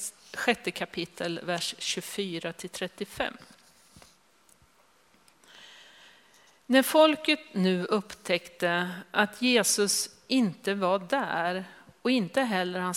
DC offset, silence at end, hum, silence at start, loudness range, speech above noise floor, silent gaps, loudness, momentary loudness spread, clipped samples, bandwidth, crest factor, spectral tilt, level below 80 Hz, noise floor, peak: under 0.1%; 0 s; none; 0 s; 13 LU; 36 dB; none; -28 LUFS; 13 LU; under 0.1%; 16 kHz; 22 dB; -3.5 dB/octave; -70 dBFS; -63 dBFS; -6 dBFS